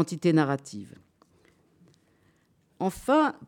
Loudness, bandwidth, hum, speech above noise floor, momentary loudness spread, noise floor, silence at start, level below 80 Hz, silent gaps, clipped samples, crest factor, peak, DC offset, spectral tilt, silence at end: -26 LUFS; 17 kHz; none; 41 dB; 19 LU; -67 dBFS; 0 s; -62 dBFS; none; under 0.1%; 16 dB; -12 dBFS; under 0.1%; -6.5 dB/octave; 0 s